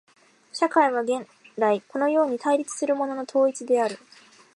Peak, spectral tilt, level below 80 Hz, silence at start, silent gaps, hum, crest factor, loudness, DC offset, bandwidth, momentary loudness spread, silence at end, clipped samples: -6 dBFS; -4 dB/octave; -82 dBFS; 0.55 s; none; none; 20 dB; -24 LUFS; under 0.1%; 11.5 kHz; 8 LU; 0.6 s; under 0.1%